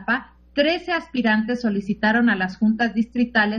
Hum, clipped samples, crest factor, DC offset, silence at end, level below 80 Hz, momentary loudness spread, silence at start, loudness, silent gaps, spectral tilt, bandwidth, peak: none; under 0.1%; 16 dB; under 0.1%; 0 s; -52 dBFS; 6 LU; 0 s; -21 LUFS; none; -6.5 dB/octave; 6.6 kHz; -4 dBFS